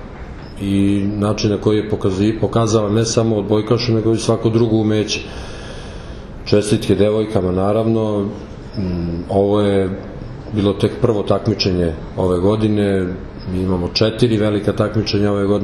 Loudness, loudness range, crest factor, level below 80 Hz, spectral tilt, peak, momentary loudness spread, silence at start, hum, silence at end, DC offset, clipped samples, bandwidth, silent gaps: -17 LUFS; 2 LU; 16 dB; -36 dBFS; -6.5 dB/octave; 0 dBFS; 15 LU; 0 s; none; 0 s; under 0.1%; under 0.1%; 12 kHz; none